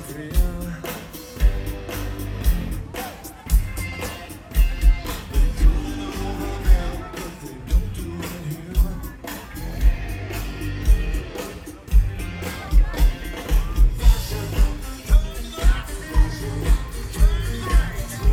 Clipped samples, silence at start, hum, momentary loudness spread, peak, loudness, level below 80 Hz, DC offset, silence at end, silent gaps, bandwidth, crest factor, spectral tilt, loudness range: under 0.1%; 0 s; none; 11 LU; -4 dBFS; -25 LUFS; -20 dBFS; under 0.1%; 0 s; none; 16.5 kHz; 18 dB; -5.5 dB/octave; 4 LU